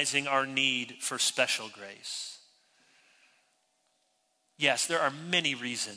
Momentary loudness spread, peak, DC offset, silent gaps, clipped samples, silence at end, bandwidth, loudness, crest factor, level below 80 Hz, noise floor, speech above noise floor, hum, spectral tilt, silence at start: 12 LU; -10 dBFS; under 0.1%; none; under 0.1%; 0 s; 11 kHz; -29 LUFS; 22 dB; -86 dBFS; -74 dBFS; 44 dB; none; -1.5 dB/octave; 0 s